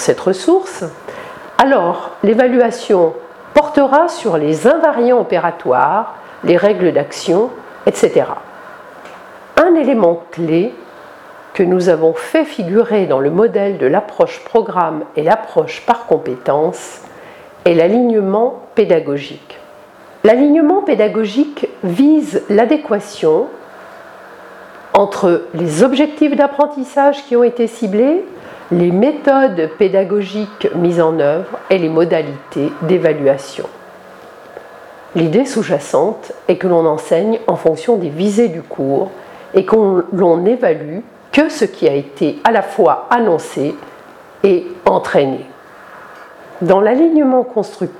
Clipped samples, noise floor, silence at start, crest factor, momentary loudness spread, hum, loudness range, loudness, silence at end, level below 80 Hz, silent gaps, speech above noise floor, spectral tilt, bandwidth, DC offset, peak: under 0.1%; -39 dBFS; 0 s; 14 dB; 11 LU; none; 3 LU; -14 LUFS; 0 s; -58 dBFS; none; 26 dB; -6.5 dB/octave; 13 kHz; under 0.1%; 0 dBFS